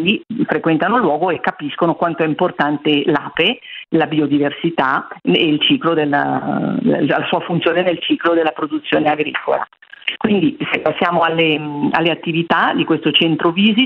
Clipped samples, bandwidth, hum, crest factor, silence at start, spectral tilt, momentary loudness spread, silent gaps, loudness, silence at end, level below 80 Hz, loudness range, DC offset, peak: under 0.1%; 5.4 kHz; none; 16 dB; 0 s; -8 dB/octave; 5 LU; none; -16 LUFS; 0 s; -58 dBFS; 2 LU; under 0.1%; 0 dBFS